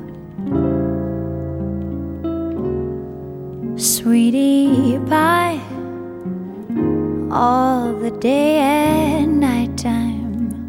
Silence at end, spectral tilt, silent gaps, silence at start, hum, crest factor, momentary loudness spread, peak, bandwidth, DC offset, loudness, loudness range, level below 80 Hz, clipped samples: 0 s; -5 dB/octave; none; 0 s; none; 14 dB; 14 LU; -4 dBFS; 17 kHz; under 0.1%; -18 LUFS; 6 LU; -40 dBFS; under 0.1%